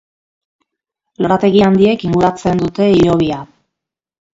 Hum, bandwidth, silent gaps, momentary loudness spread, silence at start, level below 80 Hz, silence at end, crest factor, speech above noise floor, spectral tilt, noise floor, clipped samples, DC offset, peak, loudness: none; 7.8 kHz; none; 7 LU; 1.2 s; -42 dBFS; 0.9 s; 14 dB; 69 dB; -7.5 dB/octave; -81 dBFS; under 0.1%; under 0.1%; 0 dBFS; -13 LUFS